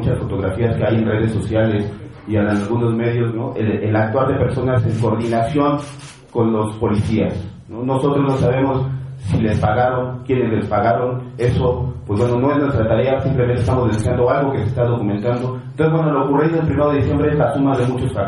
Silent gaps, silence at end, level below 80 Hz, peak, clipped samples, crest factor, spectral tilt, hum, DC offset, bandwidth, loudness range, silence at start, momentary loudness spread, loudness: none; 0 s; -38 dBFS; -2 dBFS; under 0.1%; 14 dB; -8.5 dB/octave; none; under 0.1%; 11.5 kHz; 2 LU; 0 s; 6 LU; -18 LUFS